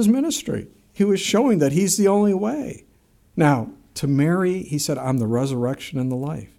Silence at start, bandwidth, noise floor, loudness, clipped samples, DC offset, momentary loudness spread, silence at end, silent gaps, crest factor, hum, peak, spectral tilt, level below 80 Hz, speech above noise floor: 0 s; 16 kHz; -57 dBFS; -21 LUFS; under 0.1%; under 0.1%; 12 LU; 0.1 s; none; 18 dB; none; -2 dBFS; -5.5 dB/octave; -54 dBFS; 37 dB